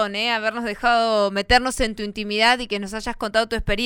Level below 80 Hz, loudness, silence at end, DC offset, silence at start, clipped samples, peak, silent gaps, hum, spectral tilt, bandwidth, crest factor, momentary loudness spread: -36 dBFS; -21 LUFS; 0 s; under 0.1%; 0 s; under 0.1%; -6 dBFS; none; none; -3.5 dB/octave; 16.5 kHz; 16 dB; 9 LU